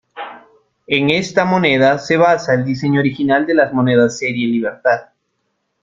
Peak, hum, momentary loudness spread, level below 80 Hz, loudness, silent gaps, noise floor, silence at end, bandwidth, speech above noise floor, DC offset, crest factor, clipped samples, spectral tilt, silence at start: 0 dBFS; none; 6 LU; -56 dBFS; -15 LUFS; none; -69 dBFS; 0.8 s; 7.8 kHz; 55 dB; under 0.1%; 16 dB; under 0.1%; -6 dB/octave; 0.15 s